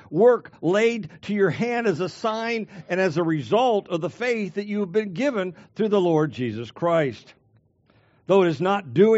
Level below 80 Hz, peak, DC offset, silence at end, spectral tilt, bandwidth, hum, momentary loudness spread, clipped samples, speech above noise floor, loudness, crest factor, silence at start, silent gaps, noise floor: -68 dBFS; -6 dBFS; under 0.1%; 0 s; -5 dB/octave; 8 kHz; none; 10 LU; under 0.1%; 39 dB; -23 LUFS; 18 dB; 0.1 s; none; -61 dBFS